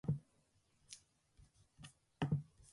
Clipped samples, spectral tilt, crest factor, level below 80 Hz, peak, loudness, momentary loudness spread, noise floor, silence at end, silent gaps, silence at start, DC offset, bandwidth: under 0.1%; -6.5 dB/octave; 22 dB; -68 dBFS; -26 dBFS; -43 LUFS; 19 LU; -77 dBFS; 0.3 s; none; 0.05 s; under 0.1%; 11.5 kHz